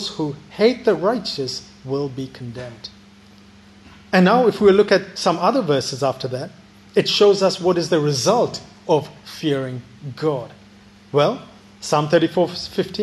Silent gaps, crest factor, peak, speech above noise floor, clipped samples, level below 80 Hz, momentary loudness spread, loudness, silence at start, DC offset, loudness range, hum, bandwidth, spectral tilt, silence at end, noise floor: none; 18 dB; -2 dBFS; 28 dB; under 0.1%; -58 dBFS; 18 LU; -19 LUFS; 0 s; under 0.1%; 6 LU; none; 12.5 kHz; -5 dB/octave; 0 s; -47 dBFS